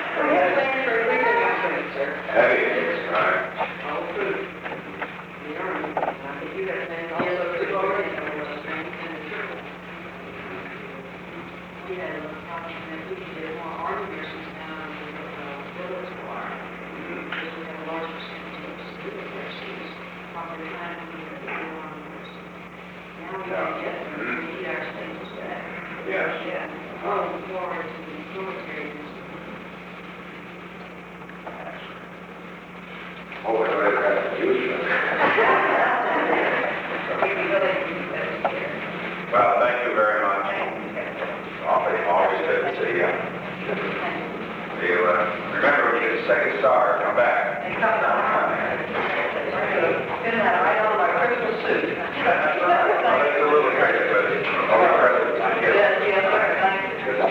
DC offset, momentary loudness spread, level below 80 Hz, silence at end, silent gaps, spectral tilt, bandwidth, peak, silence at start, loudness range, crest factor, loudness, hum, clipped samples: under 0.1%; 18 LU; -60 dBFS; 0 s; none; -6 dB/octave; 9.2 kHz; -4 dBFS; 0 s; 14 LU; 20 dB; -23 LUFS; none; under 0.1%